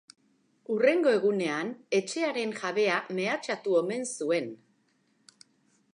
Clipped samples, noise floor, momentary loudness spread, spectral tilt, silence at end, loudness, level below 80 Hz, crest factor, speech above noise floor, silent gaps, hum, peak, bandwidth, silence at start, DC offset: under 0.1%; -70 dBFS; 8 LU; -4 dB/octave; 1.4 s; -28 LUFS; -86 dBFS; 18 dB; 42 dB; none; none; -10 dBFS; 11.5 kHz; 0.7 s; under 0.1%